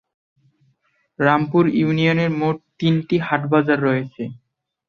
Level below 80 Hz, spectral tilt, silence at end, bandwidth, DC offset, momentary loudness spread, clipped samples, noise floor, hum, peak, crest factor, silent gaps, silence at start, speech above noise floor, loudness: -60 dBFS; -8.5 dB/octave; 0.5 s; 6.8 kHz; under 0.1%; 7 LU; under 0.1%; -65 dBFS; none; -2 dBFS; 18 dB; none; 1.2 s; 47 dB; -19 LUFS